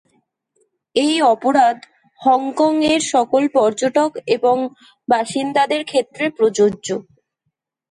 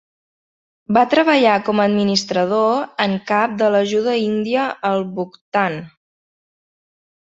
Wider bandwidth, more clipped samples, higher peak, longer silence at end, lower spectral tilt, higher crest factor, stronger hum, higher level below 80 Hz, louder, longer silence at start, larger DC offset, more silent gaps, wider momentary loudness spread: first, 11.5 kHz vs 7.8 kHz; neither; about the same, -4 dBFS vs -2 dBFS; second, 0.9 s vs 1.5 s; second, -3.5 dB/octave vs -5 dB/octave; about the same, 14 dB vs 16 dB; neither; about the same, -62 dBFS vs -62 dBFS; about the same, -17 LUFS vs -17 LUFS; about the same, 0.95 s vs 0.9 s; neither; second, none vs 5.41-5.52 s; about the same, 8 LU vs 8 LU